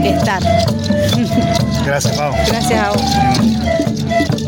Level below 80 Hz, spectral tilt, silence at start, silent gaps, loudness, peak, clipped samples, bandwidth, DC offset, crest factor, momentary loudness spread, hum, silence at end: -30 dBFS; -5.5 dB/octave; 0 s; none; -14 LUFS; -2 dBFS; under 0.1%; 17 kHz; under 0.1%; 12 dB; 2 LU; none; 0 s